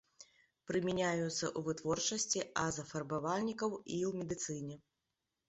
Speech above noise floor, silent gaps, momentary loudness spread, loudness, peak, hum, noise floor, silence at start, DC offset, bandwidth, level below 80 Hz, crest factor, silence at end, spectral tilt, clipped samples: 50 dB; none; 7 LU; -37 LUFS; -20 dBFS; none; -88 dBFS; 0.2 s; under 0.1%; 8 kHz; -70 dBFS; 20 dB; 0.7 s; -4.5 dB/octave; under 0.1%